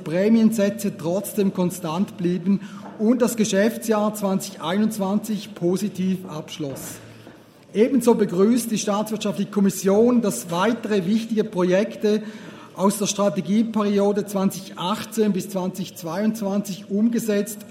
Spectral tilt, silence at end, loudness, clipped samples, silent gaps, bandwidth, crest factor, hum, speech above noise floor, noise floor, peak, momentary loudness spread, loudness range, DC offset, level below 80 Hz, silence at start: -5.5 dB/octave; 0 s; -22 LUFS; under 0.1%; none; 16 kHz; 16 dB; none; 25 dB; -46 dBFS; -6 dBFS; 10 LU; 4 LU; under 0.1%; -68 dBFS; 0 s